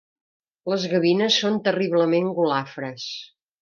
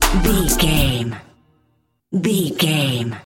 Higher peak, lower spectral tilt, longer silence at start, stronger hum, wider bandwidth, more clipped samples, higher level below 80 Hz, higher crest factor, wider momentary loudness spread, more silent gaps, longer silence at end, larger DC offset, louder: second, -6 dBFS vs -2 dBFS; about the same, -5 dB/octave vs -4 dB/octave; first, 0.65 s vs 0 s; neither; second, 7.2 kHz vs 17 kHz; neither; second, -74 dBFS vs -26 dBFS; about the same, 18 dB vs 18 dB; first, 13 LU vs 9 LU; neither; first, 0.35 s vs 0.05 s; neither; second, -22 LUFS vs -18 LUFS